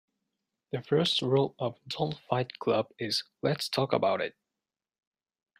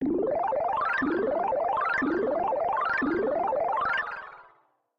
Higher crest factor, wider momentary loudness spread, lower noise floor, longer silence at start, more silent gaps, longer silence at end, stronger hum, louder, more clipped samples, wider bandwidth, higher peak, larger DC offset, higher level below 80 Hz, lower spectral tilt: first, 22 dB vs 10 dB; first, 9 LU vs 2 LU; first, under -90 dBFS vs -64 dBFS; first, 0.75 s vs 0 s; neither; first, 1.3 s vs 0.55 s; neither; second, -30 LUFS vs -27 LUFS; neither; first, 15.5 kHz vs 7.4 kHz; first, -10 dBFS vs -18 dBFS; neither; second, -70 dBFS vs -58 dBFS; second, -5.5 dB/octave vs -7 dB/octave